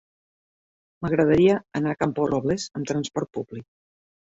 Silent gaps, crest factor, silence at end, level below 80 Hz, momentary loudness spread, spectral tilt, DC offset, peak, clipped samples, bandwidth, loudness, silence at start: none; 18 dB; 0.6 s; -54 dBFS; 15 LU; -6.5 dB/octave; under 0.1%; -6 dBFS; under 0.1%; 8 kHz; -24 LUFS; 1 s